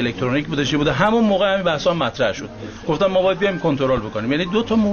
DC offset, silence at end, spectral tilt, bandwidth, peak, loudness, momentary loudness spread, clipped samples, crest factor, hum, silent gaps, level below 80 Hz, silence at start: under 0.1%; 0 s; -6 dB/octave; 7 kHz; -2 dBFS; -19 LUFS; 6 LU; under 0.1%; 16 dB; none; none; -44 dBFS; 0 s